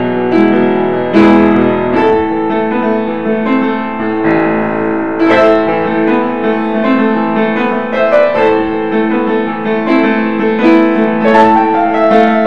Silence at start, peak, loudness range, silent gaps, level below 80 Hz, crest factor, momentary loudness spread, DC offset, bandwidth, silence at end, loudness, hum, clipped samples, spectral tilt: 0 s; 0 dBFS; 2 LU; none; -46 dBFS; 10 dB; 6 LU; 2%; 6.6 kHz; 0 s; -11 LUFS; none; 0.3%; -8 dB/octave